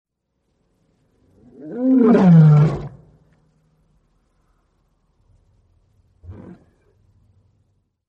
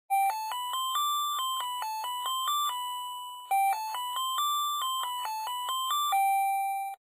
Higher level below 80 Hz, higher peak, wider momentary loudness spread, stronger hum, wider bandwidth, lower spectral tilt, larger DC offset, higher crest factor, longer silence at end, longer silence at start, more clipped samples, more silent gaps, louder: first, -52 dBFS vs under -90 dBFS; first, -2 dBFS vs -20 dBFS; first, 30 LU vs 7 LU; neither; second, 5.2 kHz vs 16 kHz; first, -11 dB/octave vs 7.5 dB/octave; neither; first, 18 dB vs 10 dB; first, 1.75 s vs 0.05 s; first, 1.65 s vs 0.1 s; neither; neither; first, -13 LUFS vs -30 LUFS